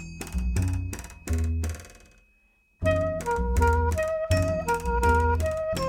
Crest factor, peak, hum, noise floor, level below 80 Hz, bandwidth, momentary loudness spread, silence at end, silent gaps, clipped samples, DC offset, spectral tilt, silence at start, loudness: 16 dB; -10 dBFS; none; -64 dBFS; -32 dBFS; 16.5 kHz; 10 LU; 0 s; none; under 0.1%; under 0.1%; -6 dB/octave; 0 s; -26 LUFS